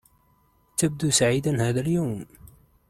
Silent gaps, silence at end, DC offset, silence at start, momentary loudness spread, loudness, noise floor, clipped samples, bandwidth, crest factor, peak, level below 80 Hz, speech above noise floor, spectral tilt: none; 0.45 s; under 0.1%; 0.75 s; 12 LU; -24 LUFS; -63 dBFS; under 0.1%; 16 kHz; 18 dB; -8 dBFS; -54 dBFS; 40 dB; -4.5 dB/octave